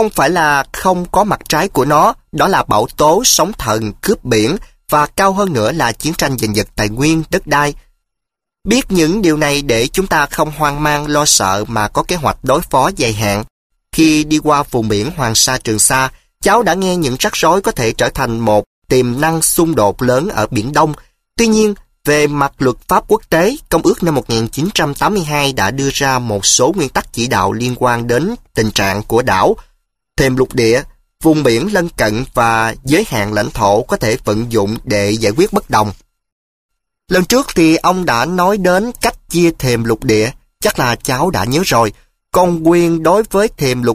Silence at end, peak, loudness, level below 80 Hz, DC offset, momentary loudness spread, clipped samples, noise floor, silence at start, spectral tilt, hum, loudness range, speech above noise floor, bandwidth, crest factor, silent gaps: 0 s; 0 dBFS; -13 LUFS; -34 dBFS; under 0.1%; 6 LU; under 0.1%; -80 dBFS; 0 s; -4 dB/octave; none; 2 LU; 67 dB; 15.5 kHz; 14 dB; 13.50-13.70 s, 18.66-18.82 s, 36.32-36.69 s